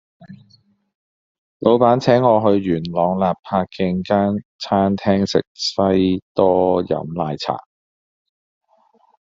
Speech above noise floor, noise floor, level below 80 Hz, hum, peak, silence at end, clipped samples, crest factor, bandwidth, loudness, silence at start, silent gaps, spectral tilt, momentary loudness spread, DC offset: 41 dB; -58 dBFS; -58 dBFS; none; -2 dBFS; 1.75 s; under 0.1%; 18 dB; 7.6 kHz; -18 LUFS; 0.2 s; 0.95-1.60 s, 3.39-3.43 s, 4.45-4.59 s, 5.47-5.55 s, 6.22-6.35 s; -5.5 dB/octave; 9 LU; under 0.1%